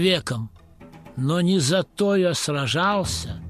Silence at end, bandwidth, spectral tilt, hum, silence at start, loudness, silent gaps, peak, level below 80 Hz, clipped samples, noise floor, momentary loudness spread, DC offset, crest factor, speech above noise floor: 0 s; 14.5 kHz; -4.5 dB/octave; none; 0 s; -22 LUFS; none; -6 dBFS; -46 dBFS; under 0.1%; -45 dBFS; 10 LU; under 0.1%; 16 dB; 23 dB